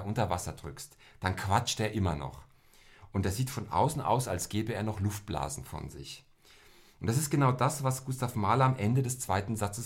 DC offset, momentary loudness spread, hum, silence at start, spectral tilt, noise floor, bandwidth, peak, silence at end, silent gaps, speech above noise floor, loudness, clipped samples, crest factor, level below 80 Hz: under 0.1%; 16 LU; none; 0 s; -5.5 dB/octave; -58 dBFS; 16.5 kHz; -12 dBFS; 0 s; none; 27 dB; -31 LUFS; under 0.1%; 20 dB; -54 dBFS